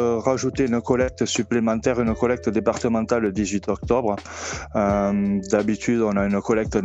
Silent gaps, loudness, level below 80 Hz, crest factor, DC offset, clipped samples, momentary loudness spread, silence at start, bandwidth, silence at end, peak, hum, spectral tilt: none; -22 LUFS; -42 dBFS; 18 dB; under 0.1%; under 0.1%; 4 LU; 0 s; 8.2 kHz; 0 s; -4 dBFS; none; -5.5 dB/octave